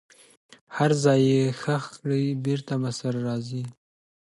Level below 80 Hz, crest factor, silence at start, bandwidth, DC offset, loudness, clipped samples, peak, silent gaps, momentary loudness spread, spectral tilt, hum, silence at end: -68 dBFS; 18 dB; 0.7 s; 11.5 kHz; under 0.1%; -25 LUFS; under 0.1%; -6 dBFS; none; 13 LU; -6.5 dB/octave; none; 0.5 s